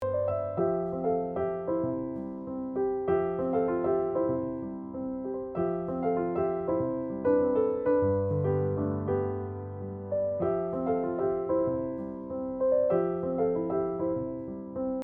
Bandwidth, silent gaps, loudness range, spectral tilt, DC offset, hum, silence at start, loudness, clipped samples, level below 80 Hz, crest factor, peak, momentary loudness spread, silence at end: 3.4 kHz; none; 3 LU; -12 dB/octave; under 0.1%; none; 0 s; -30 LUFS; under 0.1%; -58 dBFS; 14 dB; -16 dBFS; 10 LU; 0 s